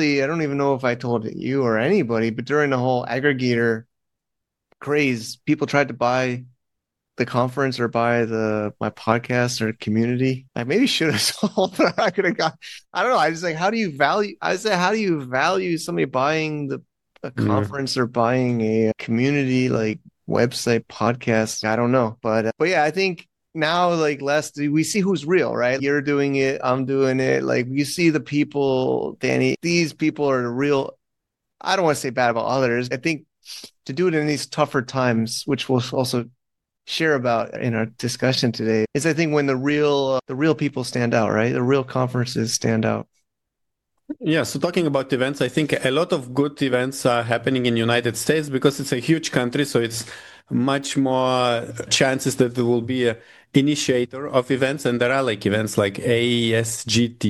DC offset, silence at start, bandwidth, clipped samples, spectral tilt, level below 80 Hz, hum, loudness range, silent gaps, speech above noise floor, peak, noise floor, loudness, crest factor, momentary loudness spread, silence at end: under 0.1%; 0 s; 12.5 kHz; under 0.1%; -5 dB/octave; -62 dBFS; none; 2 LU; none; 62 dB; -2 dBFS; -82 dBFS; -21 LUFS; 20 dB; 5 LU; 0 s